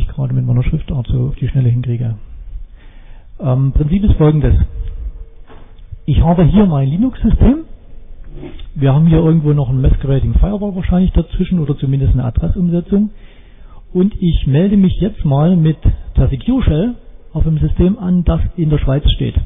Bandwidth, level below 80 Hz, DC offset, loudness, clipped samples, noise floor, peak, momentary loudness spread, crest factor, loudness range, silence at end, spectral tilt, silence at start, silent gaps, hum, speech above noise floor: 3.8 kHz; -20 dBFS; under 0.1%; -14 LUFS; under 0.1%; -35 dBFS; -2 dBFS; 11 LU; 12 dB; 3 LU; 0 s; -12.5 dB/octave; 0 s; none; none; 23 dB